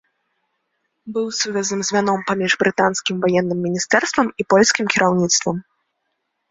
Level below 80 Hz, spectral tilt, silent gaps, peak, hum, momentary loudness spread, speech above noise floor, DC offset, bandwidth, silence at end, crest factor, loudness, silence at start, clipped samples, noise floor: -60 dBFS; -3.5 dB/octave; none; 0 dBFS; none; 7 LU; 55 dB; under 0.1%; 8 kHz; 0.9 s; 20 dB; -18 LUFS; 1.05 s; under 0.1%; -74 dBFS